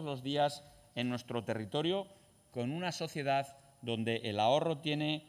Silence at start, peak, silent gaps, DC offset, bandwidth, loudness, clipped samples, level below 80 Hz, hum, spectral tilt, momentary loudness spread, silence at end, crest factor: 0 s; -18 dBFS; none; under 0.1%; 16 kHz; -35 LUFS; under 0.1%; -72 dBFS; none; -5.5 dB/octave; 14 LU; 0.05 s; 18 dB